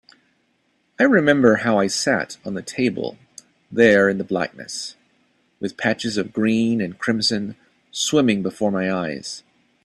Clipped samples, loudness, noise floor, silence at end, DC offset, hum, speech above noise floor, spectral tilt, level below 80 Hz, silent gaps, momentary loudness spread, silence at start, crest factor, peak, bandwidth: under 0.1%; -20 LUFS; -66 dBFS; 0.45 s; under 0.1%; none; 46 dB; -4.5 dB/octave; -60 dBFS; none; 16 LU; 1 s; 20 dB; 0 dBFS; 12.5 kHz